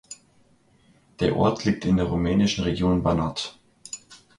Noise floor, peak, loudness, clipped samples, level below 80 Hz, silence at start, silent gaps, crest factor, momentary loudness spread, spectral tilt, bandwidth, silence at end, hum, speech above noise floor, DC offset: -60 dBFS; -8 dBFS; -23 LUFS; under 0.1%; -42 dBFS; 0.1 s; none; 16 dB; 16 LU; -6 dB/octave; 11.5 kHz; 0.25 s; none; 37 dB; under 0.1%